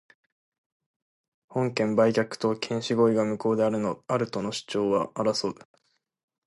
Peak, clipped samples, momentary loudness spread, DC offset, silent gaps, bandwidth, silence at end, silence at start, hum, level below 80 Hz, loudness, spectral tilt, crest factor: -8 dBFS; under 0.1%; 7 LU; under 0.1%; none; 11.5 kHz; 0.95 s; 1.5 s; none; -68 dBFS; -26 LUFS; -5.5 dB/octave; 18 dB